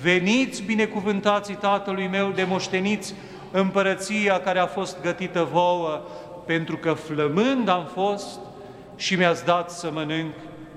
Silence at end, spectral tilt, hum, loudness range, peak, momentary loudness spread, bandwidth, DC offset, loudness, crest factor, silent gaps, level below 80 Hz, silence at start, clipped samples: 0 s; -5 dB/octave; none; 1 LU; -4 dBFS; 13 LU; 13 kHz; under 0.1%; -24 LUFS; 20 dB; none; -60 dBFS; 0 s; under 0.1%